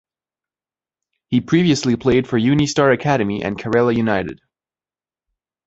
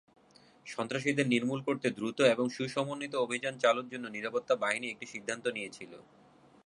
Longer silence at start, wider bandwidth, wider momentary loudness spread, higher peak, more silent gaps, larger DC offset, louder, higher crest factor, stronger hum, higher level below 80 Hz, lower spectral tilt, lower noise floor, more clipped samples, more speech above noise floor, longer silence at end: first, 1.3 s vs 0.65 s; second, 8.2 kHz vs 11 kHz; second, 6 LU vs 12 LU; first, -2 dBFS vs -10 dBFS; neither; neither; first, -17 LUFS vs -32 LUFS; about the same, 18 dB vs 22 dB; neither; first, -48 dBFS vs -78 dBFS; first, -6 dB/octave vs -4.5 dB/octave; first, under -90 dBFS vs -61 dBFS; neither; first, over 73 dB vs 29 dB; first, 1.35 s vs 0.65 s